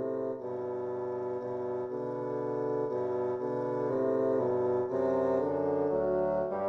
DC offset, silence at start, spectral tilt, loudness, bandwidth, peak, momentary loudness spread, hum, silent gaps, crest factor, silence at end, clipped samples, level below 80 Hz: under 0.1%; 0 s; -9.5 dB/octave; -32 LUFS; 6.2 kHz; -18 dBFS; 7 LU; none; none; 12 dB; 0 s; under 0.1%; -64 dBFS